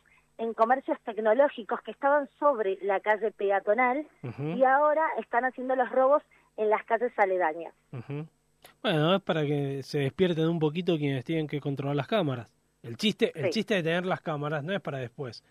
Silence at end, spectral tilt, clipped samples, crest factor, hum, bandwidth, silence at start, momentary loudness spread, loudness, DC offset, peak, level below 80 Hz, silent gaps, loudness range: 0.1 s; -6.5 dB/octave; under 0.1%; 18 dB; none; 13.5 kHz; 0.4 s; 12 LU; -28 LUFS; under 0.1%; -10 dBFS; -72 dBFS; none; 3 LU